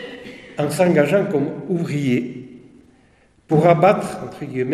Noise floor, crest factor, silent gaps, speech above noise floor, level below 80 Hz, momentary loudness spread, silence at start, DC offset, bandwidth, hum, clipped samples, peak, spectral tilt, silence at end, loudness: -55 dBFS; 20 dB; none; 37 dB; -58 dBFS; 18 LU; 0 s; under 0.1%; 14 kHz; none; under 0.1%; 0 dBFS; -7 dB/octave; 0 s; -18 LUFS